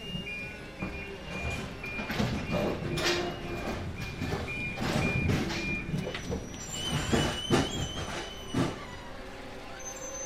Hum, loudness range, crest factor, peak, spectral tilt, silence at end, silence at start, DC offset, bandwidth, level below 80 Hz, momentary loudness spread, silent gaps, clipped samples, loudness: none; 2 LU; 20 dB; -12 dBFS; -4.5 dB/octave; 0 s; 0 s; under 0.1%; 16 kHz; -46 dBFS; 12 LU; none; under 0.1%; -33 LUFS